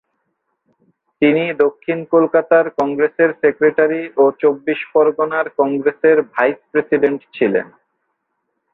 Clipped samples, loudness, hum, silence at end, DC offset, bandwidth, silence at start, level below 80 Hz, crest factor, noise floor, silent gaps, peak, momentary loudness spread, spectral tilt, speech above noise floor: under 0.1%; -16 LUFS; none; 1.1 s; under 0.1%; 4.1 kHz; 1.2 s; -64 dBFS; 16 dB; -72 dBFS; none; -2 dBFS; 5 LU; -8.5 dB/octave; 57 dB